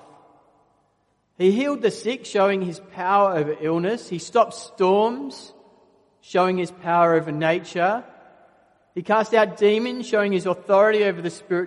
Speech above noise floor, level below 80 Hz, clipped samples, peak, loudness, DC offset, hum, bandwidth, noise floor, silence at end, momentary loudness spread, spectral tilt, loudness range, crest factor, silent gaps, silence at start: 46 dB; -72 dBFS; under 0.1%; -4 dBFS; -21 LUFS; under 0.1%; none; 11.5 kHz; -67 dBFS; 0 s; 10 LU; -5.5 dB/octave; 2 LU; 18 dB; none; 1.4 s